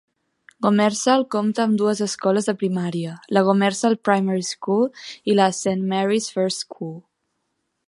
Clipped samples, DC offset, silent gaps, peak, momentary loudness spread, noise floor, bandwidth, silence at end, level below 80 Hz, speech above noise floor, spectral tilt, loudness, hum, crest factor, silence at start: under 0.1%; under 0.1%; none; -2 dBFS; 9 LU; -74 dBFS; 11.5 kHz; 0.9 s; -70 dBFS; 54 dB; -5 dB/octave; -21 LUFS; none; 20 dB; 0.6 s